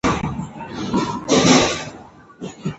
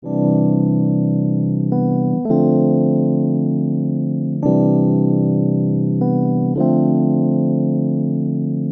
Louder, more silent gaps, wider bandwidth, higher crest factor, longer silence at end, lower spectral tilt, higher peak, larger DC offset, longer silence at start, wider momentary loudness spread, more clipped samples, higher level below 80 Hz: about the same, -18 LUFS vs -17 LUFS; neither; first, 8.2 kHz vs 1.6 kHz; first, 20 dB vs 12 dB; about the same, 0 s vs 0 s; second, -4 dB/octave vs -15 dB/octave; first, 0 dBFS vs -4 dBFS; neither; about the same, 0.05 s vs 0.05 s; first, 21 LU vs 4 LU; neither; first, -42 dBFS vs -60 dBFS